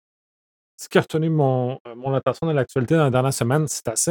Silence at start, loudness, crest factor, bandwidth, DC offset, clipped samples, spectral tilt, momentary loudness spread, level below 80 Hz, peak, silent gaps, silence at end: 0.8 s; -21 LUFS; 20 dB; 19 kHz; under 0.1%; under 0.1%; -5.5 dB/octave; 6 LU; -58 dBFS; -2 dBFS; 1.80-1.85 s; 0 s